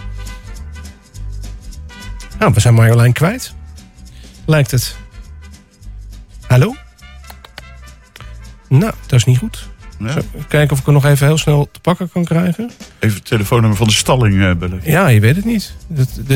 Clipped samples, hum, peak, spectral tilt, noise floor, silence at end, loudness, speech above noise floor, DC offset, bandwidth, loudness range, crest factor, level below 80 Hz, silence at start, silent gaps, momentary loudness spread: under 0.1%; none; -2 dBFS; -6 dB/octave; -37 dBFS; 0 s; -13 LUFS; 24 dB; under 0.1%; 16.5 kHz; 7 LU; 14 dB; -32 dBFS; 0 s; none; 23 LU